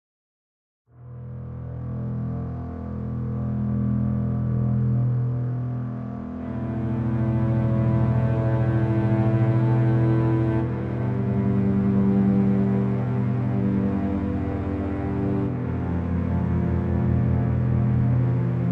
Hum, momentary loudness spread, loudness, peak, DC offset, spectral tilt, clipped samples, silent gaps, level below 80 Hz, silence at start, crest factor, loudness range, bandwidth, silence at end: none; 10 LU; -24 LUFS; -10 dBFS; under 0.1%; -11.5 dB/octave; under 0.1%; none; -44 dBFS; 1 s; 14 dB; 6 LU; 3.9 kHz; 0 s